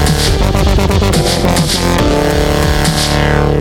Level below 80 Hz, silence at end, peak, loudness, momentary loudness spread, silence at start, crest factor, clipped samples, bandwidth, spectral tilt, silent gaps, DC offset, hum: -18 dBFS; 0 s; 0 dBFS; -12 LUFS; 1 LU; 0 s; 10 dB; under 0.1%; 17 kHz; -5 dB/octave; none; under 0.1%; none